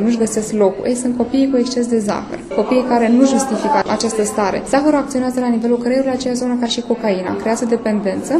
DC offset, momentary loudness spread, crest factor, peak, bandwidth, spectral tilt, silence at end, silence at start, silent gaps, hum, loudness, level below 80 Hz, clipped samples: under 0.1%; 5 LU; 16 dB; 0 dBFS; 13 kHz; -4.5 dB/octave; 0 s; 0 s; none; none; -16 LUFS; -48 dBFS; under 0.1%